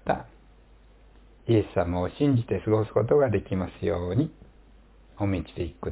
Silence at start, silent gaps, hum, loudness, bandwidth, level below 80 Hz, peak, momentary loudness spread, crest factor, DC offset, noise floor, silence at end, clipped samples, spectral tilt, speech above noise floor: 0.05 s; none; none; -26 LUFS; 4 kHz; -44 dBFS; -10 dBFS; 9 LU; 18 dB; under 0.1%; -54 dBFS; 0 s; under 0.1%; -12 dB/octave; 29 dB